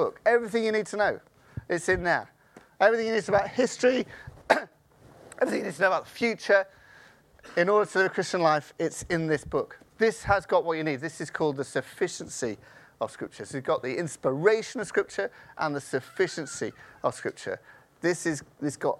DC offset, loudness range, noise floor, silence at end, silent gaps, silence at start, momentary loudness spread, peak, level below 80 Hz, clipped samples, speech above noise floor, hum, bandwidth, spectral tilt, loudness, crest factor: under 0.1%; 5 LU; -56 dBFS; 0.05 s; none; 0 s; 12 LU; -4 dBFS; -56 dBFS; under 0.1%; 29 dB; none; 14 kHz; -4.5 dB/octave; -27 LUFS; 24 dB